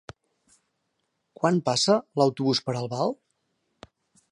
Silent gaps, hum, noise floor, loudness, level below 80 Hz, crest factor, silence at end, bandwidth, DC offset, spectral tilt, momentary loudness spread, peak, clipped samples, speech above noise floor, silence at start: none; none; -77 dBFS; -25 LUFS; -68 dBFS; 20 dB; 1.2 s; 11 kHz; under 0.1%; -5 dB/octave; 8 LU; -8 dBFS; under 0.1%; 53 dB; 1.4 s